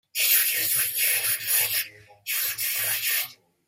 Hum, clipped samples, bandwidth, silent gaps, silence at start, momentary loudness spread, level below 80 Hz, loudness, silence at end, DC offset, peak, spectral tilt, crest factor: none; under 0.1%; 16.5 kHz; none; 0.15 s; 9 LU; -72 dBFS; -22 LUFS; 0.35 s; under 0.1%; -6 dBFS; 2 dB/octave; 20 dB